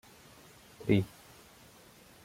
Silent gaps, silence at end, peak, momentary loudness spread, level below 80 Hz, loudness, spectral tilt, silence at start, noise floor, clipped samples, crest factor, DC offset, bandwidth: none; 1.2 s; -14 dBFS; 26 LU; -64 dBFS; -32 LUFS; -7 dB/octave; 0.8 s; -57 dBFS; under 0.1%; 24 dB; under 0.1%; 16.5 kHz